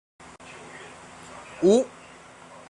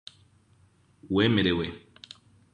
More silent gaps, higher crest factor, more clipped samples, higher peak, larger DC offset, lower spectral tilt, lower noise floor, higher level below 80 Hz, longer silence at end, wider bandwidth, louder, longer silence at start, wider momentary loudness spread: neither; about the same, 20 dB vs 20 dB; neither; about the same, -8 dBFS vs -10 dBFS; neither; second, -5.5 dB/octave vs -7 dB/octave; second, -48 dBFS vs -62 dBFS; second, -64 dBFS vs -52 dBFS; about the same, 0.8 s vs 0.75 s; first, 11.5 kHz vs 10 kHz; first, -22 LUFS vs -26 LUFS; second, 0.75 s vs 1.05 s; about the same, 26 LU vs 25 LU